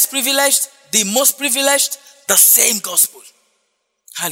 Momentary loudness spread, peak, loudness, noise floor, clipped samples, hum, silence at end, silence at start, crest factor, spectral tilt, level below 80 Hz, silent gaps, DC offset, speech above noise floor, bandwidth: 10 LU; 0 dBFS; -12 LUFS; -68 dBFS; under 0.1%; none; 0 s; 0 s; 16 dB; 0 dB/octave; -68 dBFS; none; under 0.1%; 53 dB; over 20 kHz